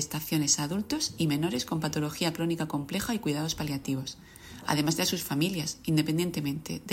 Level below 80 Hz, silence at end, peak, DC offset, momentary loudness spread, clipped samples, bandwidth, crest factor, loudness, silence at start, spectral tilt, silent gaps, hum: -56 dBFS; 0 s; -12 dBFS; under 0.1%; 8 LU; under 0.1%; 16.5 kHz; 18 dB; -29 LUFS; 0 s; -4 dB/octave; none; none